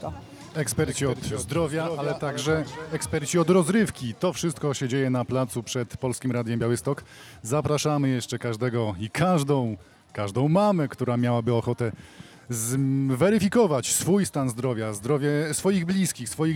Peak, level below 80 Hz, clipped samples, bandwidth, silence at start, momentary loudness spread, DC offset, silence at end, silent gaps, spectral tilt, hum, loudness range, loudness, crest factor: -8 dBFS; -56 dBFS; under 0.1%; 17.5 kHz; 0 s; 9 LU; under 0.1%; 0 s; none; -5.5 dB/octave; none; 4 LU; -25 LUFS; 16 dB